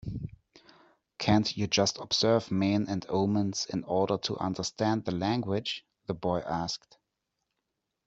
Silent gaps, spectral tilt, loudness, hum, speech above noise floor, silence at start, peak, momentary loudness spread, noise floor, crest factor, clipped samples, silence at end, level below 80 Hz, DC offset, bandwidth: none; -5 dB/octave; -30 LUFS; none; 55 dB; 0.05 s; -10 dBFS; 10 LU; -84 dBFS; 20 dB; under 0.1%; 1.3 s; -58 dBFS; under 0.1%; 8 kHz